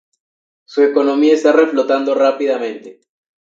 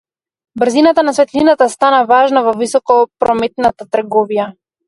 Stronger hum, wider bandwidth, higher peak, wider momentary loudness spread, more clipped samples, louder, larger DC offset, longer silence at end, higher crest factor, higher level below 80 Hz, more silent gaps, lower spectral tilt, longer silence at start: neither; second, 7.8 kHz vs 11.5 kHz; about the same, 0 dBFS vs 0 dBFS; first, 11 LU vs 8 LU; neither; about the same, -14 LUFS vs -12 LUFS; neither; first, 0.5 s vs 0.35 s; about the same, 14 dB vs 12 dB; second, -76 dBFS vs -52 dBFS; neither; about the same, -4 dB/octave vs -4 dB/octave; first, 0.7 s vs 0.55 s